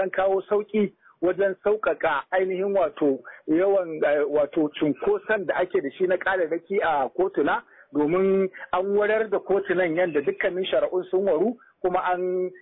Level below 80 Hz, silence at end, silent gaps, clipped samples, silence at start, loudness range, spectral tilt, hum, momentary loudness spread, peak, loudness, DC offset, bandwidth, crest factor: -62 dBFS; 0.05 s; none; under 0.1%; 0 s; 1 LU; -10 dB/octave; none; 4 LU; -12 dBFS; -24 LUFS; under 0.1%; 4 kHz; 12 dB